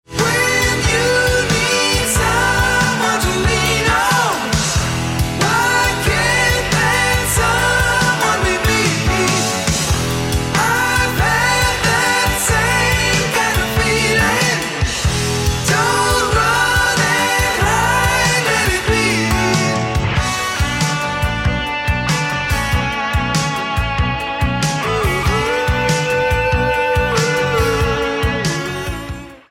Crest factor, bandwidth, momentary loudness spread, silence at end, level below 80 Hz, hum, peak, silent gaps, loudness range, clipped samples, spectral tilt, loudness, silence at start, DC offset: 14 dB; 16.5 kHz; 5 LU; 0.15 s; -26 dBFS; none; -2 dBFS; none; 3 LU; under 0.1%; -3.5 dB/octave; -15 LUFS; 0.1 s; under 0.1%